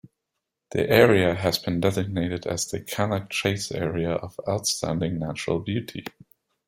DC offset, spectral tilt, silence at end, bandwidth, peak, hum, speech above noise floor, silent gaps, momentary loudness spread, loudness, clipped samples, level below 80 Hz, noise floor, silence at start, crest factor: under 0.1%; -4.5 dB/octave; 0.6 s; 16 kHz; -2 dBFS; none; 58 dB; none; 12 LU; -25 LUFS; under 0.1%; -54 dBFS; -83 dBFS; 0.7 s; 22 dB